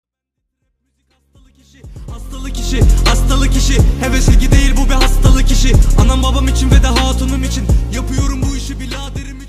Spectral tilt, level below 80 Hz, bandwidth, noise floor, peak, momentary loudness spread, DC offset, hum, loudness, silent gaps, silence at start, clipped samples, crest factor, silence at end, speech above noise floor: -5 dB/octave; -14 dBFS; 15 kHz; -75 dBFS; 0 dBFS; 12 LU; under 0.1%; none; -14 LUFS; none; 1.85 s; under 0.1%; 12 dB; 0 s; 65 dB